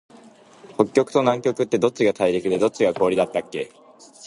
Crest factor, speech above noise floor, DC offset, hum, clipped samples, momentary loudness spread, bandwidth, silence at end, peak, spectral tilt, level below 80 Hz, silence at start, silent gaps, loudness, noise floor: 20 dB; 28 dB; under 0.1%; none; under 0.1%; 11 LU; 11.5 kHz; 0 s; -2 dBFS; -5.5 dB/octave; -62 dBFS; 0.7 s; none; -21 LUFS; -48 dBFS